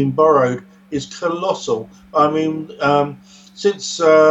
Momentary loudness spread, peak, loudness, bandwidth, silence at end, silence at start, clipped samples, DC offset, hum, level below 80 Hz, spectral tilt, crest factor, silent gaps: 12 LU; 0 dBFS; -18 LUFS; 8.2 kHz; 0 s; 0 s; under 0.1%; under 0.1%; none; -56 dBFS; -5 dB/octave; 16 dB; none